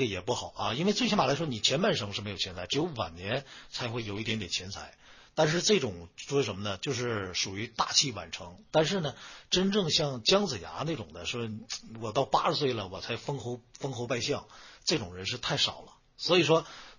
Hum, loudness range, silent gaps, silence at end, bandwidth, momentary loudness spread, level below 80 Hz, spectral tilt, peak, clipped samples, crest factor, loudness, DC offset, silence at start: none; 4 LU; none; 0.05 s; 7.4 kHz; 13 LU; -58 dBFS; -3.5 dB/octave; -10 dBFS; under 0.1%; 22 dB; -30 LUFS; under 0.1%; 0 s